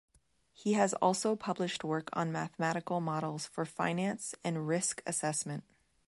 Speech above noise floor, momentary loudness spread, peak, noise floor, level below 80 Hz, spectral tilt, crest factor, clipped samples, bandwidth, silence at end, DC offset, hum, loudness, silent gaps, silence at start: 34 dB; 8 LU; -14 dBFS; -68 dBFS; -76 dBFS; -4.5 dB/octave; 20 dB; under 0.1%; 11.5 kHz; 0.45 s; under 0.1%; none; -34 LUFS; none; 0.6 s